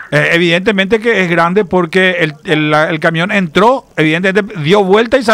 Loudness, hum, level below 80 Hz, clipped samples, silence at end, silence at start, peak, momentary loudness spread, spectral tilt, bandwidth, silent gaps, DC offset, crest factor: -11 LUFS; none; -46 dBFS; under 0.1%; 0 s; 0 s; 0 dBFS; 4 LU; -6 dB/octave; 15 kHz; none; under 0.1%; 10 dB